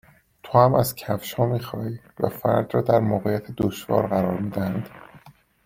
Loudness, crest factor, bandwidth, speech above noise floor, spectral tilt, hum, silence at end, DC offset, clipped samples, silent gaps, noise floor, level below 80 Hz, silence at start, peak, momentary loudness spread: -23 LUFS; 22 dB; 16.5 kHz; 29 dB; -7 dB/octave; none; 0.35 s; under 0.1%; under 0.1%; none; -51 dBFS; -54 dBFS; 0.45 s; -2 dBFS; 11 LU